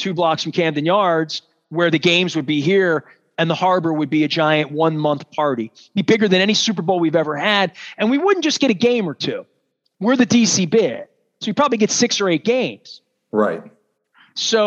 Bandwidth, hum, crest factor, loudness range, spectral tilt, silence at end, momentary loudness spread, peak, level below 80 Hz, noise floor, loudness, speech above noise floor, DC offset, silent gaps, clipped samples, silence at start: 8.4 kHz; none; 18 dB; 2 LU; -4 dB/octave; 0 s; 10 LU; -2 dBFS; -72 dBFS; -57 dBFS; -18 LUFS; 40 dB; under 0.1%; none; under 0.1%; 0 s